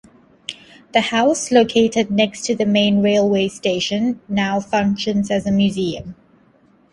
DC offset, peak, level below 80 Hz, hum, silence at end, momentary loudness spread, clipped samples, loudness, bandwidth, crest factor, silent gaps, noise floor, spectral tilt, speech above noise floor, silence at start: under 0.1%; -2 dBFS; -52 dBFS; none; 0.8 s; 11 LU; under 0.1%; -18 LUFS; 11.5 kHz; 16 dB; none; -54 dBFS; -5 dB/octave; 37 dB; 0.5 s